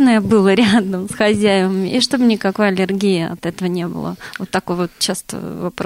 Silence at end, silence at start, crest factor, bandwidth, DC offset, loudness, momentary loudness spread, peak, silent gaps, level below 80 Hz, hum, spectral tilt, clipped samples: 0 s; 0 s; 12 dB; 16 kHz; under 0.1%; -16 LUFS; 12 LU; -4 dBFS; none; -50 dBFS; none; -5 dB/octave; under 0.1%